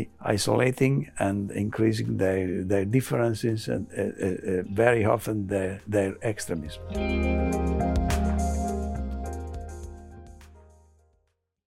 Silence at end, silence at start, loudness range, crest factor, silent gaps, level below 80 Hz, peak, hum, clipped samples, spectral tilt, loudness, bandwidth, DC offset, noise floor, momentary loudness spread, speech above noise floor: 1.05 s; 0 s; 5 LU; 22 dB; none; -38 dBFS; -6 dBFS; none; under 0.1%; -6.5 dB/octave; -27 LUFS; 16 kHz; under 0.1%; -73 dBFS; 12 LU; 47 dB